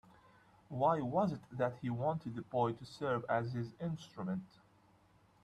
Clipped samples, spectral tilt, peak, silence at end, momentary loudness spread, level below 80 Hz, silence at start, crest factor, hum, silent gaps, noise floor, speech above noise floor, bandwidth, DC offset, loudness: under 0.1%; -8 dB/octave; -18 dBFS; 0.95 s; 9 LU; -72 dBFS; 0.7 s; 20 dB; none; none; -68 dBFS; 31 dB; 11.5 kHz; under 0.1%; -38 LUFS